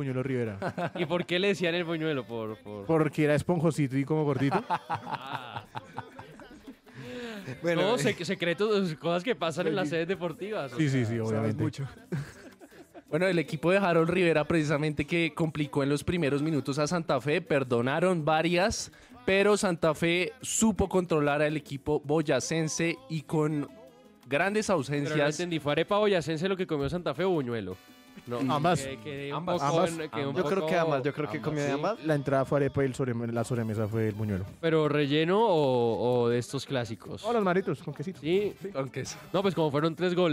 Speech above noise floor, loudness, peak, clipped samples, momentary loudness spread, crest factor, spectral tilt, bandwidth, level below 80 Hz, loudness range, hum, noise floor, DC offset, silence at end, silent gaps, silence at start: 25 dB; -29 LUFS; -14 dBFS; under 0.1%; 11 LU; 14 dB; -5.5 dB/octave; 16 kHz; -56 dBFS; 4 LU; none; -53 dBFS; under 0.1%; 0 s; none; 0 s